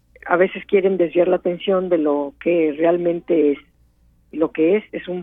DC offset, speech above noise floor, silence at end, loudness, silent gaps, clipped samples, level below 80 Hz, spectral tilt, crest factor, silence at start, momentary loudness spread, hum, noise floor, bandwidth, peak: under 0.1%; 38 dB; 0 s; -19 LUFS; none; under 0.1%; -56 dBFS; -9.5 dB/octave; 18 dB; 0.25 s; 5 LU; none; -56 dBFS; 3.8 kHz; -2 dBFS